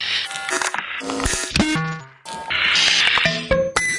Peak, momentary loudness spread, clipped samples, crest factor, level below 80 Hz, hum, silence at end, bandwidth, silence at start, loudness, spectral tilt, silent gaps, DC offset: -2 dBFS; 13 LU; under 0.1%; 18 dB; -38 dBFS; none; 0 s; 11.5 kHz; 0 s; -18 LUFS; -2 dB/octave; none; under 0.1%